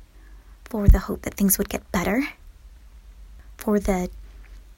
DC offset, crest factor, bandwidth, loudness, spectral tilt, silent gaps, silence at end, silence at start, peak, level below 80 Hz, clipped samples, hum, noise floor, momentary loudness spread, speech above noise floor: under 0.1%; 22 dB; 16.5 kHz; -24 LUFS; -5.5 dB/octave; none; 0.15 s; 0 s; -2 dBFS; -28 dBFS; under 0.1%; none; -46 dBFS; 12 LU; 25 dB